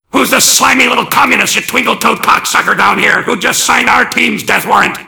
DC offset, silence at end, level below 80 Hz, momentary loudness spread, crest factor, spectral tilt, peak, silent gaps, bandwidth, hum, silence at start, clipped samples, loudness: under 0.1%; 0 s; -46 dBFS; 5 LU; 10 dB; -1.5 dB/octave; 0 dBFS; none; over 20 kHz; none; 0.15 s; 2%; -8 LUFS